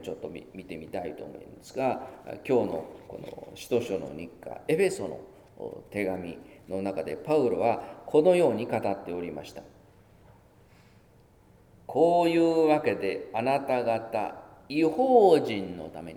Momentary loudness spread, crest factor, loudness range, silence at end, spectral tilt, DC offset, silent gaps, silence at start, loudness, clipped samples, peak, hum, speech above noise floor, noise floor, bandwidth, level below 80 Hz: 20 LU; 20 dB; 7 LU; 0 s; -6.5 dB/octave; under 0.1%; none; 0 s; -27 LUFS; under 0.1%; -8 dBFS; none; 31 dB; -58 dBFS; 16.5 kHz; -64 dBFS